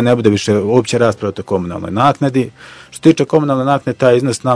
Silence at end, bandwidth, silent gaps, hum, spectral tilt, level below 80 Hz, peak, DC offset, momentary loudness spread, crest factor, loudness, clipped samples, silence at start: 0 s; 11 kHz; none; none; -6.5 dB/octave; -50 dBFS; 0 dBFS; under 0.1%; 7 LU; 14 dB; -14 LUFS; 0.5%; 0 s